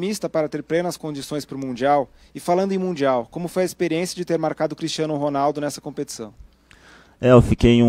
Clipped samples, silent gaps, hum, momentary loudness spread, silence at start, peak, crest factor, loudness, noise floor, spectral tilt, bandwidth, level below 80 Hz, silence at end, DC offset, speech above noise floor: under 0.1%; none; none; 15 LU; 0 s; 0 dBFS; 20 dB; -22 LUFS; -50 dBFS; -6 dB/octave; 16 kHz; -40 dBFS; 0 s; under 0.1%; 30 dB